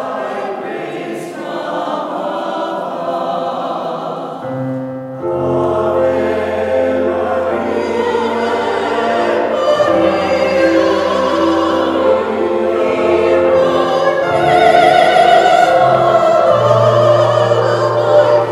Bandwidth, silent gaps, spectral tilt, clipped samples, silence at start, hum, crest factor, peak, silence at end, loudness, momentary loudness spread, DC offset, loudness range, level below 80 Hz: 13 kHz; none; -6 dB/octave; under 0.1%; 0 s; none; 14 dB; 0 dBFS; 0 s; -13 LUFS; 12 LU; under 0.1%; 10 LU; -48 dBFS